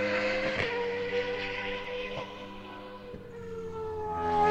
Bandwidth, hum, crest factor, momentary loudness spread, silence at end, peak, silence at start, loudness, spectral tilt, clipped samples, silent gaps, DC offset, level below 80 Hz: 8.8 kHz; none; 20 dB; 15 LU; 0 s; -12 dBFS; 0 s; -33 LUFS; -5 dB/octave; under 0.1%; none; under 0.1%; -52 dBFS